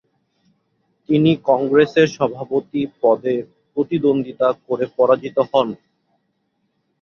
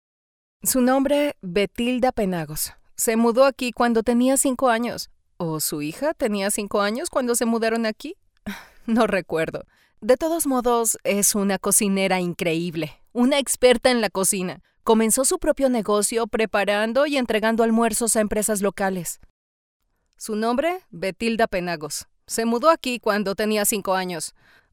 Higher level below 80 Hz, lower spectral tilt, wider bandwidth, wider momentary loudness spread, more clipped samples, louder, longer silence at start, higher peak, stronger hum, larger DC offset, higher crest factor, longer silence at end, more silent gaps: second, -62 dBFS vs -50 dBFS; first, -7 dB/octave vs -3.5 dB/octave; second, 7 kHz vs 19 kHz; about the same, 9 LU vs 11 LU; neither; first, -18 LUFS vs -22 LUFS; first, 1.1 s vs 0.65 s; first, 0 dBFS vs -4 dBFS; neither; neither; about the same, 18 dB vs 18 dB; first, 1.25 s vs 0.45 s; second, none vs 19.30-19.80 s